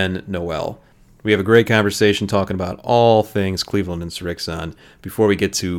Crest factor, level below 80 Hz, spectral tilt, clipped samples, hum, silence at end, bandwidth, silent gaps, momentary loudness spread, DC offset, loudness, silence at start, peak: 18 dB; -46 dBFS; -5 dB/octave; under 0.1%; none; 0 s; 17.5 kHz; none; 14 LU; under 0.1%; -18 LUFS; 0 s; 0 dBFS